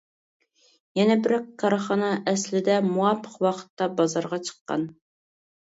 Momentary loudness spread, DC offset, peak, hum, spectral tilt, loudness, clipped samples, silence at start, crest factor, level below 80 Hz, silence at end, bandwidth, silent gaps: 8 LU; under 0.1%; -8 dBFS; none; -5 dB/octave; -25 LUFS; under 0.1%; 0.95 s; 18 dB; -72 dBFS; 0.75 s; 8 kHz; 3.70-3.77 s, 4.61-4.65 s